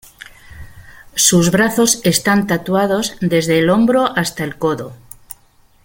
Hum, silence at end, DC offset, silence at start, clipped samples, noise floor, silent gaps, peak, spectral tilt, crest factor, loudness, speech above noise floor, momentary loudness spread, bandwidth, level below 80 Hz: none; 0.5 s; under 0.1%; 0.5 s; under 0.1%; -51 dBFS; none; 0 dBFS; -4 dB/octave; 16 dB; -15 LUFS; 37 dB; 12 LU; 17 kHz; -46 dBFS